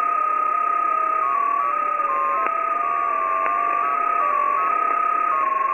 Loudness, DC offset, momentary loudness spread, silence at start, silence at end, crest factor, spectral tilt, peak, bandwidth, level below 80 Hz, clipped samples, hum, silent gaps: -20 LUFS; 0.1%; 2 LU; 0 s; 0 s; 18 dB; -4 dB/octave; -2 dBFS; 8.8 kHz; -72 dBFS; under 0.1%; none; none